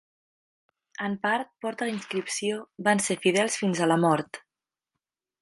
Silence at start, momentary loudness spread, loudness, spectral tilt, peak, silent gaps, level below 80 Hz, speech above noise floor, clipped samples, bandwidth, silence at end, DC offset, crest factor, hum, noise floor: 1 s; 11 LU; -26 LUFS; -4 dB/octave; -8 dBFS; none; -74 dBFS; over 64 dB; under 0.1%; 11.5 kHz; 1.05 s; under 0.1%; 20 dB; none; under -90 dBFS